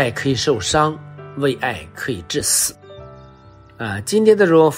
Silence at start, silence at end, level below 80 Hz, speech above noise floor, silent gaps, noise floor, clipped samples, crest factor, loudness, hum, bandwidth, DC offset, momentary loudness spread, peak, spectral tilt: 0 s; 0 s; -48 dBFS; 27 dB; none; -44 dBFS; under 0.1%; 18 dB; -18 LUFS; none; 16 kHz; under 0.1%; 21 LU; -2 dBFS; -3.5 dB/octave